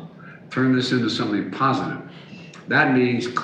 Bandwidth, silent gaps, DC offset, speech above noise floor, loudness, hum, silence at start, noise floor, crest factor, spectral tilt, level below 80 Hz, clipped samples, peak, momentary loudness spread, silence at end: 9.2 kHz; none; under 0.1%; 20 dB; -21 LUFS; none; 0 s; -41 dBFS; 18 dB; -6 dB/octave; -66 dBFS; under 0.1%; -4 dBFS; 22 LU; 0 s